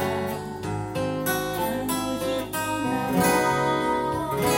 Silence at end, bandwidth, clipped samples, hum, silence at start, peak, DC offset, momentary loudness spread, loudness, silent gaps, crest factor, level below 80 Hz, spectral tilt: 0 s; 17 kHz; under 0.1%; none; 0 s; -8 dBFS; under 0.1%; 8 LU; -25 LUFS; none; 16 dB; -48 dBFS; -4.5 dB/octave